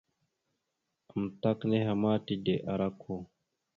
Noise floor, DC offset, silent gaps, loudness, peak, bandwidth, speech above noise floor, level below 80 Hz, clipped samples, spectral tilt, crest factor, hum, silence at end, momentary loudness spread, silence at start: -84 dBFS; under 0.1%; none; -32 LUFS; -14 dBFS; 4.6 kHz; 53 dB; -64 dBFS; under 0.1%; -9 dB/octave; 18 dB; none; 0.55 s; 12 LU; 1.15 s